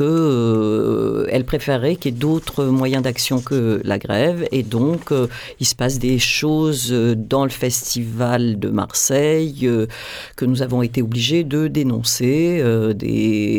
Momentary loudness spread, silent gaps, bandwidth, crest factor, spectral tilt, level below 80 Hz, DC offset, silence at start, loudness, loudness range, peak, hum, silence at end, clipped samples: 4 LU; none; over 20 kHz; 14 dB; -5 dB/octave; -44 dBFS; under 0.1%; 0 s; -18 LUFS; 1 LU; -4 dBFS; none; 0 s; under 0.1%